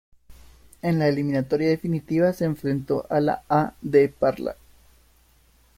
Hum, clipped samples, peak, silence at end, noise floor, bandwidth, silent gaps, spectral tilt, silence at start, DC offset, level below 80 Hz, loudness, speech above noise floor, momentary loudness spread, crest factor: none; under 0.1%; -6 dBFS; 1.25 s; -58 dBFS; 16 kHz; none; -8 dB/octave; 0.3 s; under 0.1%; -54 dBFS; -23 LUFS; 36 dB; 6 LU; 18 dB